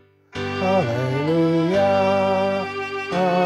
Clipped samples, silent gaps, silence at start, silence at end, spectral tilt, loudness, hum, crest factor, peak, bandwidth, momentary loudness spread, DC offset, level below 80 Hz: under 0.1%; none; 0.35 s; 0 s; -7 dB/octave; -21 LUFS; none; 12 dB; -8 dBFS; 12 kHz; 9 LU; under 0.1%; -60 dBFS